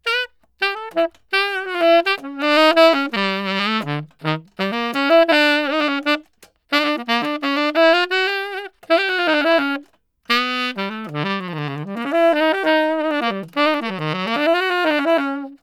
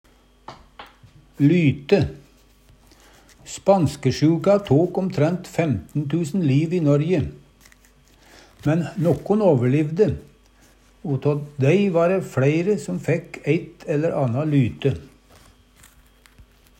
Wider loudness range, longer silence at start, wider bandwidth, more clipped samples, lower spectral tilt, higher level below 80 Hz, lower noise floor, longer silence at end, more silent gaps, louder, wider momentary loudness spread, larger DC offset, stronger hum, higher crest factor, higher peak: about the same, 3 LU vs 3 LU; second, 0.05 s vs 0.5 s; about the same, 14.5 kHz vs 14 kHz; neither; second, -5 dB/octave vs -7.5 dB/octave; second, -68 dBFS vs -52 dBFS; about the same, -52 dBFS vs -54 dBFS; second, 0.05 s vs 0.35 s; neither; first, -18 LUFS vs -21 LUFS; about the same, 10 LU vs 8 LU; neither; neither; about the same, 18 dB vs 18 dB; first, 0 dBFS vs -4 dBFS